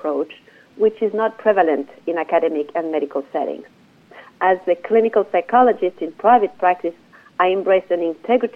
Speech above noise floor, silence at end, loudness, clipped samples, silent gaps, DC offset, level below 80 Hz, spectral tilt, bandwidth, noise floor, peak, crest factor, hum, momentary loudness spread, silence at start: 27 dB; 0.05 s; -19 LUFS; under 0.1%; none; under 0.1%; -72 dBFS; -7 dB/octave; 5.4 kHz; -45 dBFS; -2 dBFS; 16 dB; none; 10 LU; 0.05 s